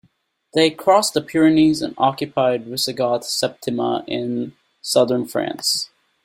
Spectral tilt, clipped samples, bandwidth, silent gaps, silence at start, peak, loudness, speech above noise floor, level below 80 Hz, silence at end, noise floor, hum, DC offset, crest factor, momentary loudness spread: -4 dB/octave; under 0.1%; 16.5 kHz; none; 0.55 s; -2 dBFS; -19 LUFS; 43 dB; -60 dBFS; 0.4 s; -62 dBFS; none; under 0.1%; 18 dB; 9 LU